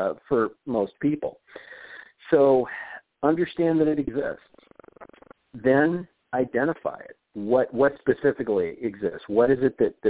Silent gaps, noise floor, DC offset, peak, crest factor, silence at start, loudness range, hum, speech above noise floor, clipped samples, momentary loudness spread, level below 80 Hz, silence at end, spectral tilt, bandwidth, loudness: none; -51 dBFS; under 0.1%; -6 dBFS; 18 dB; 0 s; 3 LU; none; 28 dB; under 0.1%; 20 LU; -58 dBFS; 0 s; -11 dB/octave; 4 kHz; -24 LUFS